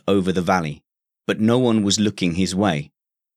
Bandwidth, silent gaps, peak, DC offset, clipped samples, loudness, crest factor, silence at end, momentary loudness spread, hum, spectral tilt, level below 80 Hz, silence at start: 14 kHz; none; -2 dBFS; under 0.1%; under 0.1%; -20 LUFS; 18 dB; 0.55 s; 13 LU; none; -5 dB/octave; -52 dBFS; 0.05 s